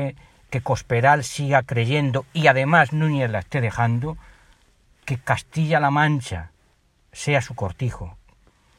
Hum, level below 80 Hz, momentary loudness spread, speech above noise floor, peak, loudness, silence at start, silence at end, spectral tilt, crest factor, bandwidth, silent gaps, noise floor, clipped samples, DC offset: none; -50 dBFS; 13 LU; 40 dB; 0 dBFS; -21 LUFS; 0 s; 0.65 s; -6 dB/octave; 22 dB; 12.5 kHz; none; -61 dBFS; under 0.1%; under 0.1%